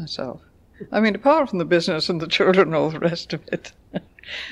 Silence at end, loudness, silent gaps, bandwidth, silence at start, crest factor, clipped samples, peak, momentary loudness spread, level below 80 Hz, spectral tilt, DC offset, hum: 0 s; -21 LUFS; none; 11 kHz; 0 s; 18 dB; under 0.1%; -4 dBFS; 17 LU; -56 dBFS; -5.5 dB/octave; under 0.1%; none